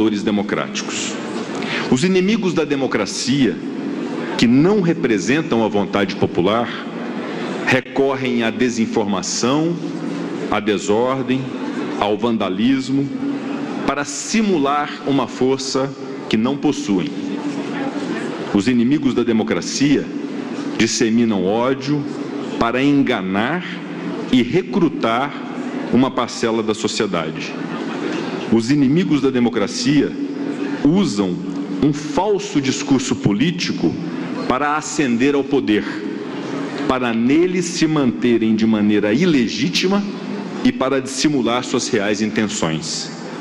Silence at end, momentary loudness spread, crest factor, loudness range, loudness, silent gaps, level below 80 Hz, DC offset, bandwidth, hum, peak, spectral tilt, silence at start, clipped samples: 0 s; 9 LU; 18 dB; 3 LU; -19 LUFS; none; -52 dBFS; under 0.1%; 11 kHz; none; 0 dBFS; -5 dB/octave; 0 s; under 0.1%